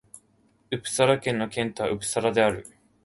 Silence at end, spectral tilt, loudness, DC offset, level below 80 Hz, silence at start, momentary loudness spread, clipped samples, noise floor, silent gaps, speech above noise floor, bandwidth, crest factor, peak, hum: 0.35 s; -4 dB/octave; -25 LUFS; under 0.1%; -58 dBFS; 0.15 s; 10 LU; under 0.1%; -64 dBFS; none; 39 dB; 12 kHz; 20 dB; -6 dBFS; none